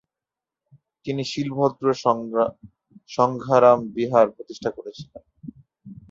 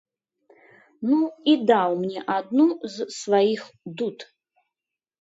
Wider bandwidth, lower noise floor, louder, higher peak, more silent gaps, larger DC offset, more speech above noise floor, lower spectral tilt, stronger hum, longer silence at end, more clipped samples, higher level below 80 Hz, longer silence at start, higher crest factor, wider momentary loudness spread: about the same, 7.8 kHz vs 8 kHz; about the same, -89 dBFS vs -88 dBFS; about the same, -22 LUFS vs -23 LUFS; about the same, -4 dBFS vs -6 dBFS; neither; neither; about the same, 67 dB vs 66 dB; about the same, -6.5 dB/octave vs -5.5 dB/octave; neither; second, 0.15 s vs 1 s; neither; first, -62 dBFS vs -76 dBFS; about the same, 1.05 s vs 1 s; about the same, 20 dB vs 18 dB; first, 24 LU vs 12 LU